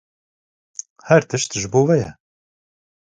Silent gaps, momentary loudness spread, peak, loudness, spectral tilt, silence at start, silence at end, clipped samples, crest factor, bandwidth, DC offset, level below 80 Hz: none; 18 LU; 0 dBFS; -18 LUFS; -5 dB/octave; 1.05 s; 0.95 s; under 0.1%; 20 dB; 9.6 kHz; under 0.1%; -54 dBFS